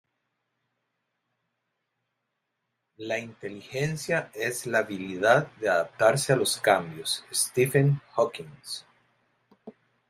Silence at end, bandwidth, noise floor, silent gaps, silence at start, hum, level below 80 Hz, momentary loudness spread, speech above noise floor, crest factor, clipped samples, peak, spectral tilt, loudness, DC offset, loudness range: 0.4 s; 16 kHz; -81 dBFS; none; 3 s; none; -70 dBFS; 15 LU; 55 dB; 24 dB; under 0.1%; -6 dBFS; -4 dB/octave; -26 LUFS; under 0.1%; 13 LU